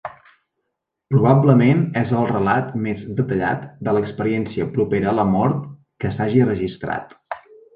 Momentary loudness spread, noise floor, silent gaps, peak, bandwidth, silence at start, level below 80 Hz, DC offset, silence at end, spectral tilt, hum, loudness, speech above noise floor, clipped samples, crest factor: 14 LU; -78 dBFS; none; -2 dBFS; 4.8 kHz; 0.05 s; -48 dBFS; under 0.1%; 0.4 s; -11 dB/octave; none; -19 LUFS; 60 dB; under 0.1%; 18 dB